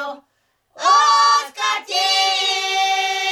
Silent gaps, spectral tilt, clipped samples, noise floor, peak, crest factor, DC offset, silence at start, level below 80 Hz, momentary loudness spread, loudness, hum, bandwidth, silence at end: none; 3 dB/octave; under 0.1%; -66 dBFS; -4 dBFS; 14 dB; under 0.1%; 0 s; -76 dBFS; 8 LU; -16 LUFS; none; 15 kHz; 0 s